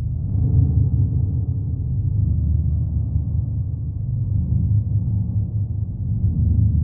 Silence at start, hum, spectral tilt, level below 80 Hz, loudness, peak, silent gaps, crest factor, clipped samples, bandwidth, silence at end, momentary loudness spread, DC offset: 0 s; none; -17 dB/octave; -26 dBFS; -21 LUFS; -6 dBFS; none; 14 dB; under 0.1%; 1.1 kHz; 0 s; 6 LU; under 0.1%